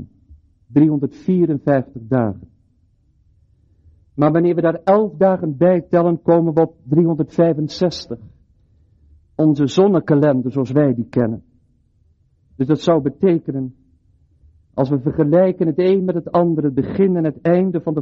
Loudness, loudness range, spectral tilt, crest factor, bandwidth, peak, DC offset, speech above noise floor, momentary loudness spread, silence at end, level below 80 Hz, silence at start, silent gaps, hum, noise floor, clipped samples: -17 LUFS; 5 LU; -8.5 dB/octave; 16 dB; 7.6 kHz; -2 dBFS; under 0.1%; 42 dB; 8 LU; 0 s; -52 dBFS; 0 s; none; none; -58 dBFS; under 0.1%